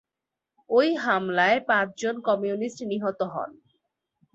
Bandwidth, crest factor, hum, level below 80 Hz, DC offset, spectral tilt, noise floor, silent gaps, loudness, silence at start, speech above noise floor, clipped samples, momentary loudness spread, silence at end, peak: 8.2 kHz; 18 dB; none; -72 dBFS; under 0.1%; -5 dB/octave; -87 dBFS; none; -25 LUFS; 0.7 s; 62 dB; under 0.1%; 9 LU; 0.85 s; -8 dBFS